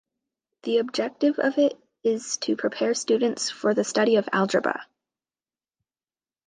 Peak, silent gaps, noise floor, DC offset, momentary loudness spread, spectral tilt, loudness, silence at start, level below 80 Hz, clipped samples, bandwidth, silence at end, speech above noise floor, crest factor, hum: -8 dBFS; none; under -90 dBFS; under 0.1%; 6 LU; -3.5 dB/octave; -24 LUFS; 0.65 s; -76 dBFS; under 0.1%; 9.8 kHz; 1.65 s; over 66 dB; 18 dB; none